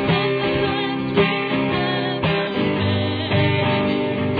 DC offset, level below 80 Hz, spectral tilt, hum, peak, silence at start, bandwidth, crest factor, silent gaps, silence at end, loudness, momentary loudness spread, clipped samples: under 0.1%; -46 dBFS; -9 dB/octave; none; -4 dBFS; 0 s; 5 kHz; 16 dB; none; 0 s; -20 LUFS; 3 LU; under 0.1%